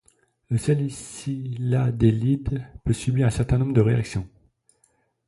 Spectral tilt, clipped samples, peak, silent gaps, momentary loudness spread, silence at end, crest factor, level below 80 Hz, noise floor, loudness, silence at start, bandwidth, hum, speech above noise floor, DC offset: -7.5 dB/octave; under 0.1%; -6 dBFS; none; 11 LU; 1 s; 18 dB; -42 dBFS; -67 dBFS; -24 LUFS; 0.5 s; 11.5 kHz; none; 44 dB; under 0.1%